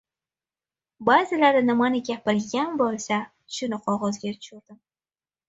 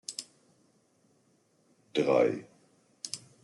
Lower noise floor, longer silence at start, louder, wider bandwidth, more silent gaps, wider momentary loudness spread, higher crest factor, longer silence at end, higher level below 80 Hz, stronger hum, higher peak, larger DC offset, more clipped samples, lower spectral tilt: first, under -90 dBFS vs -69 dBFS; first, 1 s vs 0.1 s; first, -24 LUFS vs -31 LUFS; second, 8 kHz vs 12 kHz; neither; second, 14 LU vs 18 LU; about the same, 20 dB vs 22 dB; first, 0.75 s vs 0.25 s; first, -68 dBFS vs -80 dBFS; neither; first, -4 dBFS vs -12 dBFS; neither; neither; about the same, -4.5 dB/octave vs -4 dB/octave